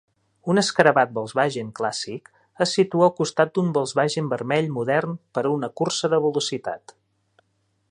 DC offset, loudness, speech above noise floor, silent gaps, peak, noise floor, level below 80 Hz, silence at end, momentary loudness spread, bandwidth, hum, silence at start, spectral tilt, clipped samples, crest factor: under 0.1%; -22 LUFS; 48 dB; none; 0 dBFS; -70 dBFS; -68 dBFS; 1.15 s; 12 LU; 11 kHz; none; 0.45 s; -4.5 dB/octave; under 0.1%; 22 dB